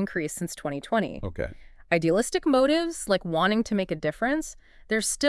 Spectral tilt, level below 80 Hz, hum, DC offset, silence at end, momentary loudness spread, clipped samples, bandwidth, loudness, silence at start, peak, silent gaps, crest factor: -4 dB/octave; -48 dBFS; none; under 0.1%; 0 s; 11 LU; under 0.1%; 12 kHz; -26 LUFS; 0 s; -8 dBFS; none; 18 dB